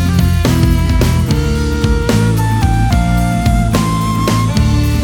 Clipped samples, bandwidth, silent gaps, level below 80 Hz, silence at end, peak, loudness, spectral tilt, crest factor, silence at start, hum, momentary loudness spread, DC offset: under 0.1%; 19.5 kHz; none; -18 dBFS; 0 s; 0 dBFS; -13 LUFS; -6 dB/octave; 12 dB; 0 s; none; 2 LU; under 0.1%